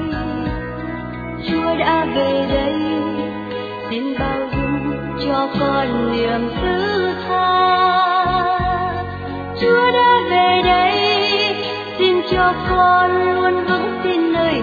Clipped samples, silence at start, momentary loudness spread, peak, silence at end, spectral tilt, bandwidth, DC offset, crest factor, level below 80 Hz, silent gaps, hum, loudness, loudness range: under 0.1%; 0 s; 11 LU; -2 dBFS; 0 s; -7 dB/octave; 5 kHz; under 0.1%; 16 dB; -36 dBFS; none; none; -17 LUFS; 5 LU